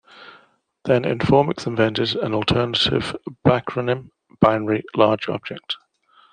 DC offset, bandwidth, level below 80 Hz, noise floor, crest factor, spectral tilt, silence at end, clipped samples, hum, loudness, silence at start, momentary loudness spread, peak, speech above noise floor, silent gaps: under 0.1%; 10 kHz; -48 dBFS; -56 dBFS; 20 dB; -6.5 dB/octave; 0.55 s; under 0.1%; none; -21 LUFS; 0.15 s; 12 LU; -2 dBFS; 36 dB; none